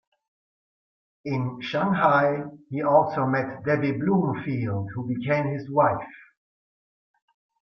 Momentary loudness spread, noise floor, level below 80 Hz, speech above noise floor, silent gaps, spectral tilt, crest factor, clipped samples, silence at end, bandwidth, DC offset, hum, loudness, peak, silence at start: 11 LU; under -90 dBFS; -64 dBFS; over 66 dB; none; -9 dB/octave; 20 dB; under 0.1%; 1.45 s; 6.4 kHz; under 0.1%; none; -24 LUFS; -6 dBFS; 1.25 s